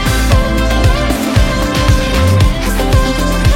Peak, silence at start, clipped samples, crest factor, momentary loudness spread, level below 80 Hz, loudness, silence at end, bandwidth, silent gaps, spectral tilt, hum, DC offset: 0 dBFS; 0 s; under 0.1%; 10 dB; 2 LU; -14 dBFS; -12 LUFS; 0 s; 16.5 kHz; none; -5.5 dB/octave; none; under 0.1%